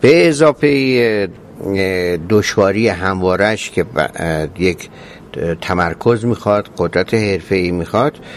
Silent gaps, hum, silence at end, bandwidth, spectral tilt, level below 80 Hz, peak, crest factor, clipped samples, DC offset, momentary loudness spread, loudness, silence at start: none; none; 0 s; 14 kHz; -6 dB/octave; -38 dBFS; 0 dBFS; 14 dB; under 0.1%; under 0.1%; 9 LU; -15 LUFS; 0 s